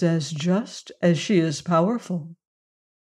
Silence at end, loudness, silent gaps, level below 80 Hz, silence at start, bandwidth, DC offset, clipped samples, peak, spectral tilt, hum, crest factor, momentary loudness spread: 0.8 s; -23 LUFS; none; -70 dBFS; 0 s; 10.5 kHz; under 0.1%; under 0.1%; -8 dBFS; -6 dB/octave; none; 16 dB; 11 LU